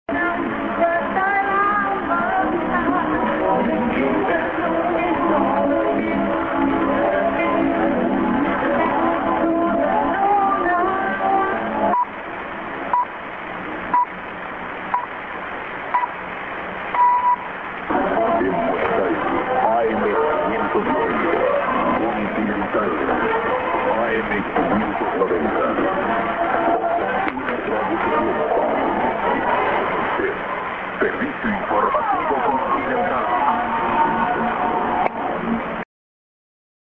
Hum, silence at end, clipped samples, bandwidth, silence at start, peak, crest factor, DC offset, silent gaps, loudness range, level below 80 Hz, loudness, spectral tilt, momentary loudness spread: none; 0.95 s; under 0.1%; 5.8 kHz; 0.1 s; -2 dBFS; 18 dB; under 0.1%; none; 3 LU; -46 dBFS; -20 LUFS; -8.5 dB/octave; 7 LU